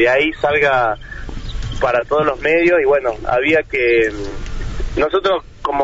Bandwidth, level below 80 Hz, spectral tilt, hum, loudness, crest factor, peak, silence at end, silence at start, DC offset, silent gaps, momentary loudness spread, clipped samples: 8 kHz; -30 dBFS; -3 dB/octave; none; -16 LUFS; 12 dB; -4 dBFS; 0 s; 0 s; under 0.1%; none; 15 LU; under 0.1%